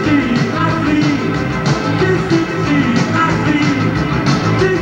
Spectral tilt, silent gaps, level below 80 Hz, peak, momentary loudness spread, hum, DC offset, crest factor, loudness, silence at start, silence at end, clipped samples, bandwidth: -6.5 dB/octave; none; -34 dBFS; -2 dBFS; 2 LU; none; under 0.1%; 12 dB; -14 LUFS; 0 s; 0 s; under 0.1%; 9.6 kHz